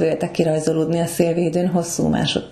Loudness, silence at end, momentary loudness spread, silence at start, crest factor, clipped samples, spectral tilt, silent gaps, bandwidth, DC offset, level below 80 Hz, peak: -20 LUFS; 0 s; 2 LU; 0 s; 16 dB; under 0.1%; -5.5 dB/octave; none; 13.5 kHz; under 0.1%; -48 dBFS; -4 dBFS